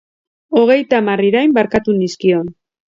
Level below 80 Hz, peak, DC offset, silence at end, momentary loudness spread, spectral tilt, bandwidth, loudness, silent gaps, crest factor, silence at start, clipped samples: -50 dBFS; 0 dBFS; under 0.1%; 0.4 s; 6 LU; -6.5 dB/octave; 7.8 kHz; -14 LUFS; none; 14 dB; 0.5 s; under 0.1%